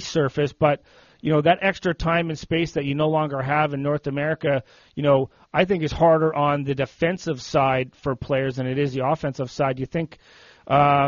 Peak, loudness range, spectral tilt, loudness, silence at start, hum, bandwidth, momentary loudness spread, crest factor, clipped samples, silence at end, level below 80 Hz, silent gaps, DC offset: -6 dBFS; 3 LU; -5 dB/octave; -23 LUFS; 0 s; none; 7.2 kHz; 8 LU; 16 dB; under 0.1%; 0 s; -48 dBFS; none; under 0.1%